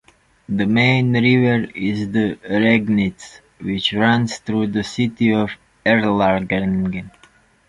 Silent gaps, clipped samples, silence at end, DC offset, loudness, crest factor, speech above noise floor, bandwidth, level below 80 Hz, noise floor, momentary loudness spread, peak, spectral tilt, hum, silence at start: none; under 0.1%; 0.6 s; under 0.1%; -18 LUFS; 16 dB; 35 dB; 11 kHz; -48 dBFS; -53 dBFS; 9 LU; -2 dBFS; -6.5 dB/octave; none; 0.5 s